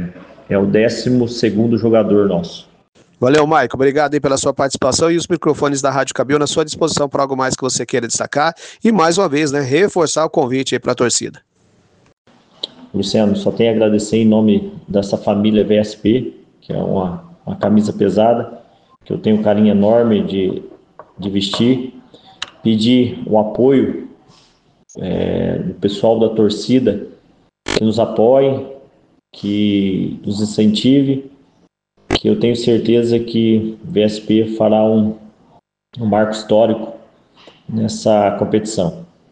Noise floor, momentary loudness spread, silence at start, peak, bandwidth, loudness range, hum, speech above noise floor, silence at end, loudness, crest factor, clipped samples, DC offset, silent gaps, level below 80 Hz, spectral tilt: -56 dBFS; 10 LU; 0 s; -2 dBFS; 9.8 kHz; 3 LU; none; 42 dB; 0.25 s; -15 LUFS; 14 dB; under 0.1%; under 0.1%; 2.88-2.93 s, 12.13-12.25 s; -48 dBFS; -5.5 dB/octave